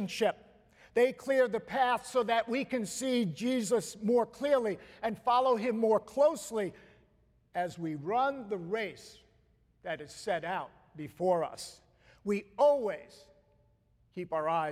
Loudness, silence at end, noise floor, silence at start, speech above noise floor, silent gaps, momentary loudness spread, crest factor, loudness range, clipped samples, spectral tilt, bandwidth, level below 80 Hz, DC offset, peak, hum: -32 LUFS; 0 s; -69 dBFS; 0 s; 38 dB; none; 13 LU; 18 dB; 7 LU; under 0.1%; -4.5 dB/octave; 15.5 kHz; -70 dBFS; under 0.1%; -16 dBFS; none